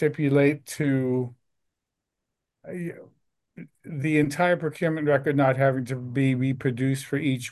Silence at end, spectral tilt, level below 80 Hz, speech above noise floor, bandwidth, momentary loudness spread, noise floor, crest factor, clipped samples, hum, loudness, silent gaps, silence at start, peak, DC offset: 0 s; -7 dB/octave; -66 dBFS; 60 dB; 12.5 kHz; 14 LU; -84 dBFS; 16 dB; under 0.1%; none; -24 LUFS; none; 0 s; -8 dBFS; under 0.1%